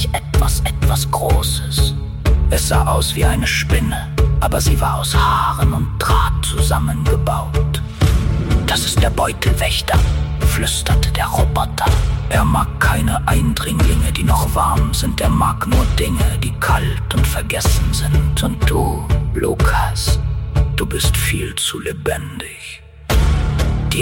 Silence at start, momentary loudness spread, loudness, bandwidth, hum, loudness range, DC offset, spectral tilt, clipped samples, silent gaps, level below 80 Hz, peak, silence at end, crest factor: 0 s; 4 LU; -17 LUFS; 17 kHz; none; 2 LU; under 0.1%; -4.5 dB/octave; under 0.1%; none; -18 dBFS; -2 dBFS; 0 s; 12 dB